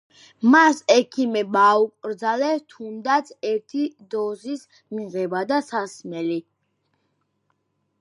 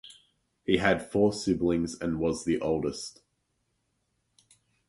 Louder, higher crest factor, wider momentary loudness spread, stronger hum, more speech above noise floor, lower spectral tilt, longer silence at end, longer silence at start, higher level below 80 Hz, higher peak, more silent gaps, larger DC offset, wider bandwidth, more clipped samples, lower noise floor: first, -21 LUFS vs -28 LUFS; about the same, 20 dB vs 22 dB; first, 16 LU vs 11 LU; neither; about the same, 50 dB vs 49 dB; second, -4 dB/octave vs -5.5 dB/octave; second, 1.6 s vs 1.8 s; first, 0.4 s vs 0.05 s; second, -80 dBFS vs -54 dBFS; first, -2 dBFS vs -8 dBFS; neither; neither; about the same, 11.5 kHz vs 11.5 kHz; neither; second, -72 dBFS vs -77 dBFS